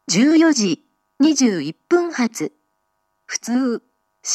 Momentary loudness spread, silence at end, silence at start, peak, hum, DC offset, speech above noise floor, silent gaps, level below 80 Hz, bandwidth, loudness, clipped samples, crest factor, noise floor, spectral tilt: 14 LU; 0 s; 0.1 s; -4 dBFS; none; under 0.1%; 53 dB; none; -74 dBFS; 13 kHz; -18 LUFS; under 0.1%; 16 dB; -70 dBFS; -3.5 dB/octave